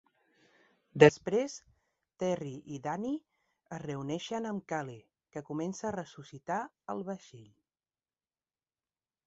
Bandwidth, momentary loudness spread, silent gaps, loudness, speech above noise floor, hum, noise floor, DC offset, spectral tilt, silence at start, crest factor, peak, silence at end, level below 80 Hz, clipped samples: 8 kHz; 23 LU; none; -33 LUFS; over 57 dB; none; under -90 dBFS; under 0.1%; -5 dB/octave; 0.95 s; 30 dB; -4 dBFS; 1.85 s; -70 dBFS; under 0.1%